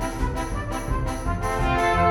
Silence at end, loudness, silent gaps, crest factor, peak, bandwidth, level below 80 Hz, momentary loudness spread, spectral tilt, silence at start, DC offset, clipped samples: 0 s; -25 LUFS; none; 16 dB; -8 dBFS; 17 kHz; -30 dBFS; 8 LU; -5.5 dB/octave; 0 s; under 0.1%; under 0.1%